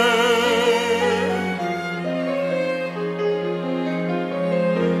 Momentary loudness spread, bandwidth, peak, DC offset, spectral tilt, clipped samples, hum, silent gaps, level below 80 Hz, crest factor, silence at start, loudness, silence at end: 8 LU; 14.5 kHz; -6 dBFS; under 0.1%; -5 dB/octave; under 0.1%; none; none; -70 dBFS; 14 dB; 0 s; -21 LUFS; 0 s